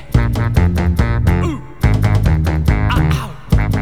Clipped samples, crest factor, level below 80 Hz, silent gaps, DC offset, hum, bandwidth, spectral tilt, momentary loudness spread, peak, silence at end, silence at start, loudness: under 0.1%; 14 dB; -18 dBFS; none; 2%; none; 15 kHz; -7.5 dB/octave; 4 LU; 0 dBFS; 0 s; 0 s; -16 LUFS